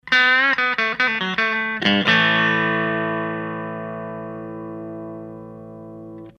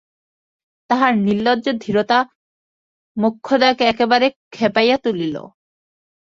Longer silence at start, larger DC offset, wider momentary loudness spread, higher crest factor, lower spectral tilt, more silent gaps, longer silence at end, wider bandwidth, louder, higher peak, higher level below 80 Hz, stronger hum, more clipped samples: second, 0.05 s vs 0.9 s; neither; first, 23 LU vs 8 LU; about the same, 20 dB vs 18 dB; about the same, -5 dB/octave vs -5.5 dB/octave; second, none vs 2.35-3.15 s, 4.36-4.51 s; second, 0.1 s vs 0.9 s; first, 9.8 kHz vs 7.6 kHz; about the same, -18 LUFS vs -17 LUFS; about the same, -2 dBFS vs -2 dBFS; about the same, -60 dBFS vs -60 dBFS; neither; neither